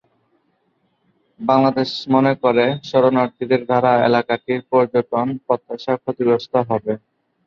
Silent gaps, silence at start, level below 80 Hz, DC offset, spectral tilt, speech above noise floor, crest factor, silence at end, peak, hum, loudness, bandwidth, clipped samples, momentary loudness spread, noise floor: none; 1.4 s; -62 dBFS; under 0.1%; -7.5 dB/octave; 48 dB; 18 dB; 0.5 s; -2 dBFS; none; -18 LUFS; 7 kHz; under 0.1%; 7 LU; -66 dBFS